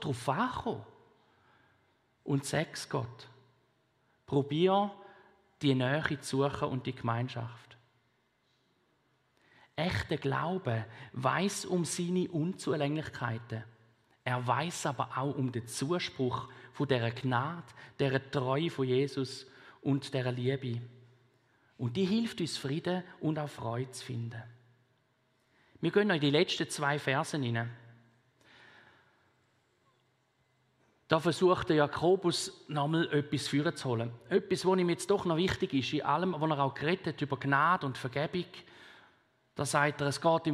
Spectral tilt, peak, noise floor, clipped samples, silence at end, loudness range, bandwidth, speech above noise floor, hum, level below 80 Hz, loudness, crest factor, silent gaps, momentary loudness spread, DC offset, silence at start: -5.5 dB/octave; -10 dBFS; -74 dBFS; under 0.1%; 0 s; 7 LU; 14.5 kHz; 42 dB; none; -66 dBFS; -32 LUFS; 24 dB; none; 11 LU; under 0.1%; 0 s